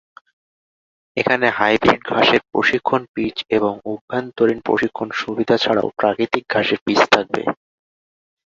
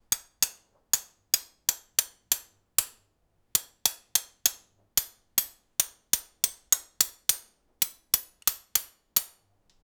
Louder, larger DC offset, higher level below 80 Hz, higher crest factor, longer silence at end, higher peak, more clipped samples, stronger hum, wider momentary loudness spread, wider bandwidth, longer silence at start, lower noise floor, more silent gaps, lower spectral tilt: first, -18 LUFS vs -28 LUFS; neither; first, -54 dBFS vs -64 dBFS; second, 20 dB vs 28 dB; first, 0.95 s vs 0.75 s; about the same, 0 dBFS vs -2 dBFS; neither; neither; first, 9 LU vs 4 LU; second, 7.8 kHz vs over 20 kHz; first, 1.15 s vs 0.1 s; first, under -90 dBFS vs -71 dBFS; first, 3.08-3.14 s, 4.01-4.08 s, 6.81-6.86 s vs none; first, -5 dB/octave vs 2 dB/octave